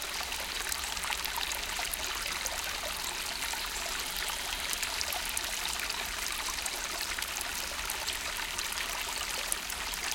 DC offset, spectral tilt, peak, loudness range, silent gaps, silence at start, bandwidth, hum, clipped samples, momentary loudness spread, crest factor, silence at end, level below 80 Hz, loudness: under 0.1%; 0.5 dB/octave; -6 dBFS; 1 LU; none; 0 s; 17 kHz; none; under 0.1%; 2 LU; 30 dB; 0 s; -50 dBFS; -33 LUFS